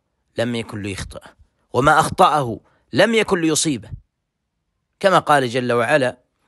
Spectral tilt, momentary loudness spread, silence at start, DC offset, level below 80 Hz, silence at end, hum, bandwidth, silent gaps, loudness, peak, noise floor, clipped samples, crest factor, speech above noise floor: -4 dB/octave; 14 LU; 0.35 s; under 0.1%; -46 dBFS; 0.35 s; none; 12.5 kHz; none; -18 LUFS; 0 dBFS; -75 dBFS; under 0.1%; 18 dB; 58 dB